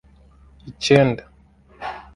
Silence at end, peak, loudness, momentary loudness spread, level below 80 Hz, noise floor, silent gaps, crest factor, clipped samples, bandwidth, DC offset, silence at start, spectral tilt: 0.15 s; 0 dBFS; -18 LUFS; 18 LU; -50 dBFS; -52 dBFS; none; 22 dB; under 0.1%; 11.5 kHz; under 0.1%; 0.65 s; -5.5 dB/octave